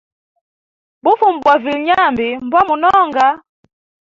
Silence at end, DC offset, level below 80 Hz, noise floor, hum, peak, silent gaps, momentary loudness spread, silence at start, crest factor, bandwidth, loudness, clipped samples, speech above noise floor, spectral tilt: 0.75 s; under 0.1%; -54 dBFS; under -90 dBFS; none; -2 dBFS; none; 5 LU; 1.05 s; 14 dB; 7.6 kHz; -13 LUFS; under 0.1%; over 77 dB; -5 dB/octave